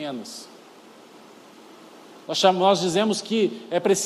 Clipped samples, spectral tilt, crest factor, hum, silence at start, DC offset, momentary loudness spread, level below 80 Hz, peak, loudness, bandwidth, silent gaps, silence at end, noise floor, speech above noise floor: under 0.1%; -4 dB/octave; 20 dB; none; 0 s; under 0.1%; 21 LU; -74 dBFS; -6 dBFS; -22 LUFS; 14 kHz; none; 0 s; -48 dBFS; 26 dB